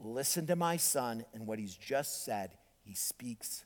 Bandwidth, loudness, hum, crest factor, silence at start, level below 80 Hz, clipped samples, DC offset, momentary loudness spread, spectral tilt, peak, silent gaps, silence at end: 19.5 kHz; -35 LUFS; none; 20 dB; 0 s; -74 dBFS; under 0.1%; under 0.1%; 12 LU; -3 dB/octave; -18 dBFS; none; 0 s